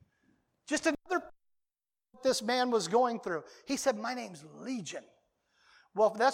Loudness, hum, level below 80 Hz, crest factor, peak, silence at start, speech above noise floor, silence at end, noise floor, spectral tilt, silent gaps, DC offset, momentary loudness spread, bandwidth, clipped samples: -32 LUFS; none; -74 dBFS; 18 dB; -14 dBFS; 0.7 s; 58 dB; 0 s; -89 dBFS; -3 dB/octave; none; under 0.1%; 13 LU; 16.5 kHz; under 0.1%